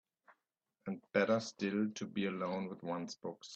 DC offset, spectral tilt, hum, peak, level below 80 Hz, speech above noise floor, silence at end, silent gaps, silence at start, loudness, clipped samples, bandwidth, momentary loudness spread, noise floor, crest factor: under 0.1%; -5.5 dB/octave; none; -16 dBFS; -80 dBFS; 49 dB; 0 s; none; 0.3 s; -38 LUFS; under 0.1%; 8.2 kHz; 13 LU; -87 dBFS; 22 dB